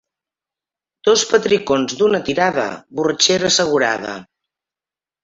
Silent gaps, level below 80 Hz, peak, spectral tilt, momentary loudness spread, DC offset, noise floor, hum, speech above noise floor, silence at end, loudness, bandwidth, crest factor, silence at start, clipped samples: none; -56 dBFS; -2 dBFS; -2.5 dB/octave; 9 LU; under 0.1%; under -90 dBFS; none; over 73 dB; 1 s; -16 LUFS; 8 kHz; 18 dB; 1.05 s; under 0.1%